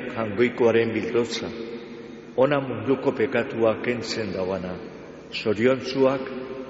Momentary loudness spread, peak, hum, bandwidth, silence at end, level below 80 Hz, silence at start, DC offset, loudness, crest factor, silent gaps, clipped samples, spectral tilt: 15 LU; -8 dBFS; none; 8 kHz; 0 s; -60 dBFS; 0 s; under 0.1%; -24 LUFS; 18 dB; none; under 0.1%; -4.5 dB/octave